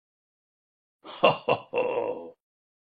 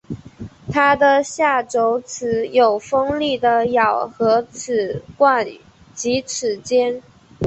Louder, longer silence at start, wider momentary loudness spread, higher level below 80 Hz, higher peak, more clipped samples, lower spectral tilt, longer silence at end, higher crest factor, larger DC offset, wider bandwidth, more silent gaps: second, -26 LUFS vs -18 LUFS; first, 1.05 s vs 0.1 s; first, 20 LU vs 11 LU; second, -76 dBFS vs -52 dBFS; about the same, -4 dBFS vs -2 dBFS; neither; first, -7 dB/octave vs -4 dB/octave; first, 0.65 s vs 0 s; first, 26 dB vs 16 dB; neither; second, 5 kHz vs 8.4 kHz; neither